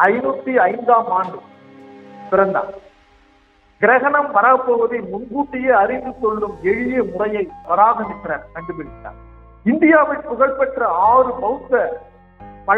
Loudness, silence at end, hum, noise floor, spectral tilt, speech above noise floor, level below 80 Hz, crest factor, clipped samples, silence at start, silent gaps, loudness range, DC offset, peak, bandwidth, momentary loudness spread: -17 LUFS; 0 s; none; -53 dBFS; -8.5 dB/octave; 37 dB; -50 dBFS; 18 dB; under 0.1%; 0 s; none; 4 LU; under 0.1%; 0 dBFS; 4.5 kHz; 16 LU